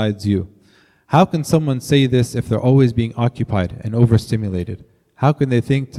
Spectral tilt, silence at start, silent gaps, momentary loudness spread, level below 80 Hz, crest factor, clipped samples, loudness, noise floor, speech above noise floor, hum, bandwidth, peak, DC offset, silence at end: -7 dB/octave; 0 s; none; 8 LU; -46 dBFS; 16 dB; under 0.1%; -17 LUFS; -54 dBFS; 37 dB; none; 13 kHz; 0 dBFS; under 0.1%; 0 s